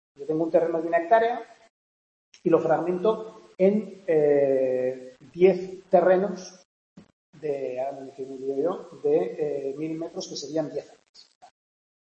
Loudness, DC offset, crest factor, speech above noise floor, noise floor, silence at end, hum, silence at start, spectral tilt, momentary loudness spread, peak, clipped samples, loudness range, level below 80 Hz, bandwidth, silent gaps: -25 LUFS; under 0.1%; 20 dB; over 66 dB; under -90 dBFS; 1.2 s; none; 0.2 s; -6.5 dB/octave; 13 LU; -6 dBFS; under 0.1%; 7 LU; -74 dBFS; 8.4 kHz; 1.70-2.32 s, 6.65-6.96 s, 7.13-7.33 s